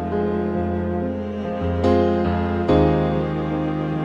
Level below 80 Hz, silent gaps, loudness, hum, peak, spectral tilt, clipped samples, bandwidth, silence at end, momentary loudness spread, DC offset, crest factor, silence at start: -36 dBFS; none; -21 LUFS; none; -4 dBFS; -9 dB/octave; under 0.1%; 7.4 kHz; 0 s; 8 LU; under 0.1%; 16 dB; 0 s